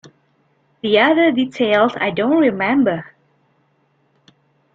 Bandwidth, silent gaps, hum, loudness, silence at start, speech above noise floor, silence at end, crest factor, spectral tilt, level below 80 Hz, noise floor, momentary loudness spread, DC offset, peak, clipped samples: 7.6 kHz; none; none; -16 LUFS; 0.05 s; 46 dB; 1.7 s; 18 dB; -6.5 dB/octave; -62 dBFS; -62 dBFS; 6 LU; under 0.1%; 0 dBFS; under 0.1%